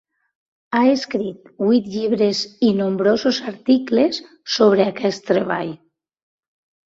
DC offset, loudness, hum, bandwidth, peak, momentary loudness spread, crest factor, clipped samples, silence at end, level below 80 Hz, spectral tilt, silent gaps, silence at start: under 0.1%; -19 LUFS; none; 7.8 kHz; -2 dBFS; 9 LU; 16 dB; under 0.1%; 1.1 s; -62 dBFS; -5.5 dB/octave; none; 0.7 s